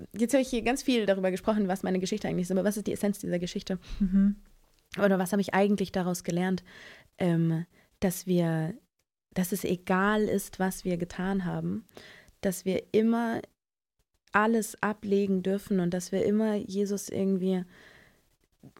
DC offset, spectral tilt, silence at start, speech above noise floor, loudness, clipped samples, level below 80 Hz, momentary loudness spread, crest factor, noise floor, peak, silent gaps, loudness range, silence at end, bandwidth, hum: under 0.1%; -6 dB/octave; 0 s; 52 dB; -29 LUFS; under 0.1%; -54 dBFS; 8 LU; 20 dB; -80 dBFS; -8 dBFS; none; 2 LU; 0.1 s; 16.5 kHz; none